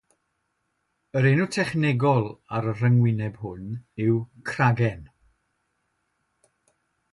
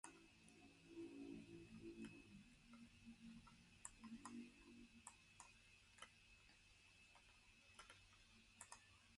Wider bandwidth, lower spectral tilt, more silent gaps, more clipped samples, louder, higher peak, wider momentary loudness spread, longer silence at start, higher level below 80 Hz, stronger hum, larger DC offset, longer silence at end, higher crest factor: about the same, 11.5 kHz vs 11.5 kHz; first, -7.5 dB/octave vs -3.5 dB/octave; neither; neither; first, -24 LUFS vs -63 LUFS; first, -8 dBFS vs -36 dBFS; about the same, 13 LU vs 11 LU; first, 1.15 s vs 0.05 s; first, -58 dBFS vs -78 dBFS; neither; neither; first, 2.05 s vs 0 s; second, 18 dB vs 28 dB